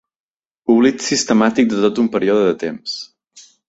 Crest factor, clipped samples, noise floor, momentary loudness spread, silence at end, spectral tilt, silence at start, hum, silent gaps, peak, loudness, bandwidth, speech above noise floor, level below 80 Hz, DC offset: 16 dB; under 0.1%; -47 dBFS; 12 LU; 0.25 s; -4 dB/octave; 0.7 s; none; none; -2 dBFS; -16 LUFS; 8 kHz; 31 dB; -58 dBFS; under 0.1%